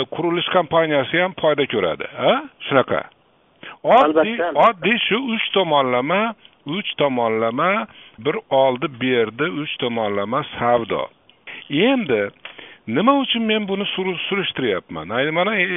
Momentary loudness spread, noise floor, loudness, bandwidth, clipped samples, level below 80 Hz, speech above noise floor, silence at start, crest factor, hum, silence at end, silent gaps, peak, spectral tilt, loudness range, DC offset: 10 LU; -49 dBFS; -19 LUFS; 4 kHz; under 0.1%; -60 dBFS; 30 dB; 0 s; 20 dB; none; 0 s; none; 0 dBFS; -2.5 dB/octave; 4 LU; under 0.1%